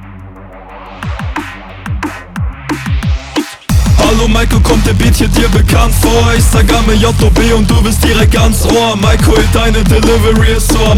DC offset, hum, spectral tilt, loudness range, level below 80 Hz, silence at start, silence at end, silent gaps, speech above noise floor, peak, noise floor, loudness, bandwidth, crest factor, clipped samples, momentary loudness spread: under 0.1%; none; -5 dB/octave; 9 LU; -14 dBFS; 0 s; 0 s; none; 22 dB; 0 dBFS; -30 dBFS; -10 LUFS; 16.5 kHz; 8 dB; under 0.1%; 12 LU